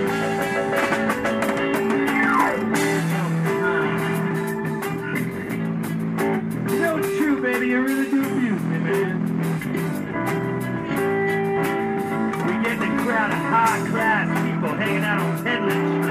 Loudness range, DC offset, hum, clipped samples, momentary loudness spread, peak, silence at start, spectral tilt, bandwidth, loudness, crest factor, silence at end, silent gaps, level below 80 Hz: 3 LU; under 0.1%; none; under 0.1%; 6 LU; -6 dBFS; 0 s; -6 dB/octave; 16 kHz; -22 LUFS; 16 dB; 0 s; none; -56 dBFS